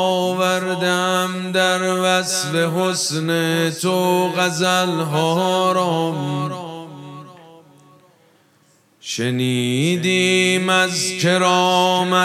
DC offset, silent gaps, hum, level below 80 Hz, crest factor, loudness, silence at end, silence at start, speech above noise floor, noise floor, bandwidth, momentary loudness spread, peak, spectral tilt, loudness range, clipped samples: under 0.1%; none; none; -70 dBFS; 18 dB; -18 LUFS; 0 s; 0 s; 39 dB; -57 dBFS; 15.5 kHz; 9 LU; -2 dBFS; -4 dB/octave; 9 LU; under 0.1%